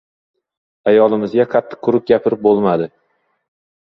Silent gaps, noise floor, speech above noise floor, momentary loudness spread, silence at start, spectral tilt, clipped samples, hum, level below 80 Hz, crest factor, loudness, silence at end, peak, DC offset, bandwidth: none; -65 dBFS; 51 dB; 7 LU; 0.85 s; -9 dB/octave; under 0.1%; none; -58 dBFS; 16 dB; -15 LUFS; 1.1 s; 0 dBFS; under 0.1%; 5.6 kHz